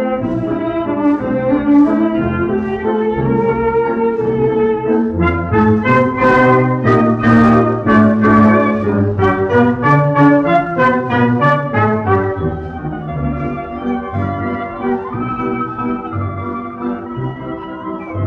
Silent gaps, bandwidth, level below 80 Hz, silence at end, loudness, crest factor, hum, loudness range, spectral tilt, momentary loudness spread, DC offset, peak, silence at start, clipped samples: none; 6.6 kHz; -38 dBFS; 0 s; -14 LUFS; 14 dB; none; 9 LU; -9.5 dB/octave; 12 LU; under 0.1%; 0 dBFS; 0 s; under 0.1%